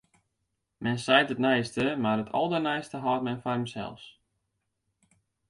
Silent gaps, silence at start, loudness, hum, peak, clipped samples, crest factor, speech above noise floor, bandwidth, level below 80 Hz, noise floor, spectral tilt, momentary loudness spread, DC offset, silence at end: none; 0.8 s; -28 LUFS; none; -8 dBFS; under 0.1%; 22 dB; 53 dB; 11.5 kHz; -66 dBFS; -80 dBFS; -5.5 dB/octave; 12 LU; under 0.1%; 1.4 s